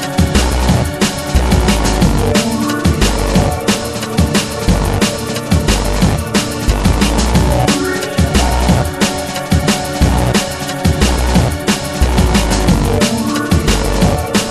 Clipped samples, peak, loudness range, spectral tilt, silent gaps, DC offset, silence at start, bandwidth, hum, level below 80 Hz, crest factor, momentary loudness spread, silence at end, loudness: under 0.1%; 0 dBFS; 1 LU; -5 dB/octave; none; 0.1%; 0 s; 14.5 kHz; none; -18 dBFS; 12 dB; 3 LU; 0 s; -14 LUFS